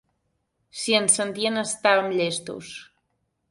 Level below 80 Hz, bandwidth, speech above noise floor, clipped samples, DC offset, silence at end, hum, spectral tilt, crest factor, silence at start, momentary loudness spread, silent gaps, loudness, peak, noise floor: -70 dBFS; 11.5 kHz; 51 dB; under 0.1%; under 0.1%; 0.65 s; none; -2 dB/octave; 20 dB; 0.75 s; 20 LU; none; -22 LUFS; -6 dBFS; -74 dBFS